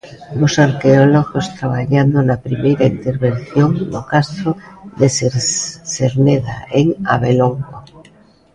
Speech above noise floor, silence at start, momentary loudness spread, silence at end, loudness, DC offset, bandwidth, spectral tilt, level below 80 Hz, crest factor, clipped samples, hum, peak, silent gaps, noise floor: 33 dB; 0.05 s; 9 LU; 0.55 s; -15 LUFS; under 0.1%; 10.5 kHz; -6 dB/octave; -44 dBFS; 14 dB; under 0.1%; none; 0 dBFS; none; -47 dBFS